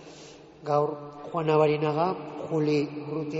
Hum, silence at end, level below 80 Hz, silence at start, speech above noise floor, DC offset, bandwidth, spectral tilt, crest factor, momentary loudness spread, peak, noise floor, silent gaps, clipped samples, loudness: none; 0 s; -68 dBFS; 0 s; 21 dB; under 0.1%; 7.8 kHz; -6 dB/octave; 18 dB; 17 LU; -10 dBFS; -48 dBFS; none; under 0.1%; -27 LUFS